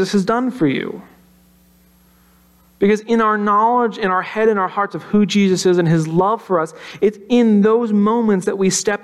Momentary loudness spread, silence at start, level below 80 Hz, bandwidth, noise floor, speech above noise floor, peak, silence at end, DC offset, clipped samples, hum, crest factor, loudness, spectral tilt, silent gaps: 6 LU; 0 s; -56 dBFS; 12.5 kHz; -52 dBFS; 36 dB; -4 dBFS; 0.05 s; under 0.1%; under 0.1%; none; 12 dB; -16 LUFS; -5.5 dB/octave; none